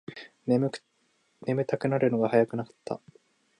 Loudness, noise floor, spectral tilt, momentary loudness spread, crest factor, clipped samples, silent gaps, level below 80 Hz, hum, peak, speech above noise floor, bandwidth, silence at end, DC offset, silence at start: -28 LUFS; -71 dBFS; -8 dB/octave; 14 LU; 22 dB; under 0.1%; none; -74 dBFS; none; -8 dBFS; 44 dB; 10.5 kHz; 0.65 s; under 0.1%; 0.1 s